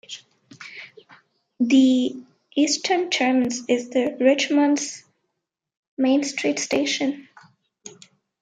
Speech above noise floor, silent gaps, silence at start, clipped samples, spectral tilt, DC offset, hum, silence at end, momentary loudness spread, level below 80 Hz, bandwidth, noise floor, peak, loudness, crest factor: 61 dB; 5.77-5.97 s; 0.1 s; under 0.1%; -2.5 dB/octave; under 0.1%; none; 0.5 s; 22 LU; -72 dBFS; 9.4 kHz; -81 dBFS; -4 dBFS; -21 LUFS; 18 dB